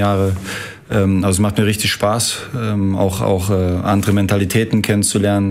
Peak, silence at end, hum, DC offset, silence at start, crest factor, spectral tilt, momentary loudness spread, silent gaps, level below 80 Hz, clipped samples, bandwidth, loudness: -2 dBFS; 0 s; none; under 0.1%; 0 s; 14 dB; -5 dB/octave; 6 LU; none; -42 dBFS; under 0.1%; 16 kHz; -16 LUFS